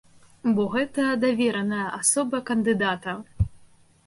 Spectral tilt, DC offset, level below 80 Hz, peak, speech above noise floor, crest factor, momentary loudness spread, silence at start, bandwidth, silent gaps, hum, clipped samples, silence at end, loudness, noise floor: -4.5 dB/octave; under 0.1%; -44 dBFS; -8 dBFS; 30 dB; 16 dB; 8 LU; 0.45 s; 12 kHz; none; none; under 0.1%; 0.4 s; -24 LUFS; -54 dBFS